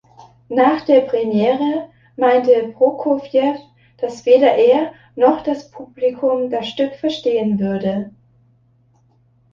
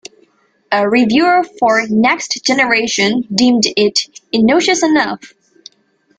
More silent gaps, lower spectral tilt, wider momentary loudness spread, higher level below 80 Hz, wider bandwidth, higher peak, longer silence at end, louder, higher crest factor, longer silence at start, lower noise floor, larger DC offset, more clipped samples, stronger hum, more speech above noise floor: neither; first, -7 dB/octave vs -3 dB/octave; first, 13 LU vs 5 LU; second, -60 dBFS vs -54 dBFS; second, 7.2 kHz vs 9.4 kHz; about the same, -2 dBFS vs 0 dBFS; first, 1.45 s vs 0.9 s; second, -17 LUFS vs -13 LUFS; about the same, 16 dB vs 14 dB; second, 0.2 s vs 0.7 s; about the same, -56 dBFS vs -57 dBFS; neither; neither; neither; second, 40 dB vs 44 dB